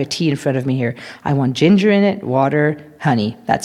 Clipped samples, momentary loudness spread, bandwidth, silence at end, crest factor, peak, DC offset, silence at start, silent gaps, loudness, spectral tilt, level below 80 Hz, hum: under 0.1%; 8 LU; 12 kHz; 0 s; 16 dB; 0 dBFS; under 0.1%; 0 s; none; -17 LUFS; -6.5 dB/octave; -56 dBFS; none